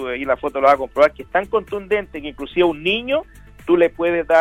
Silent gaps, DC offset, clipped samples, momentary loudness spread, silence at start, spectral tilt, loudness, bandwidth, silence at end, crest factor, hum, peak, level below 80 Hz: none; under 0.1%; under 0.1%; 8 LU; 0 s; -6 dB/octave; -19 LUFS; 12 kHz; 0 s; 16 dB; none; -2 dBFS; -46 dBFS